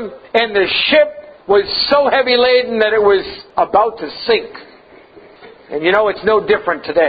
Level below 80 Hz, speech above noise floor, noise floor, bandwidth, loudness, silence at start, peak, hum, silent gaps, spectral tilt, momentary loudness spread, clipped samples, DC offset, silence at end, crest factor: -50 dBFS; 28 dB; -42 dBFS; 5 kHz; -14 LUFS; 0 s; 0 dBFS; none; none; -6.5 dB/octave; 8 LU; under 0.1%; under 0.1%; 0 s; 14 dB